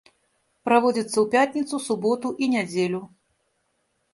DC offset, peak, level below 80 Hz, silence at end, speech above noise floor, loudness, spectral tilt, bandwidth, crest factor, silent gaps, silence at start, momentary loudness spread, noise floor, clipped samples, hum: under 0.1%; -4 dBFS; -70 dBFS; 1.05 s; 49 dB; -23 LUFS; -4.5 dB/octave; 11.5 kHz; 20 dB; none; 0.65 s; 8 LU; -72 dBFS; under 0.1%; none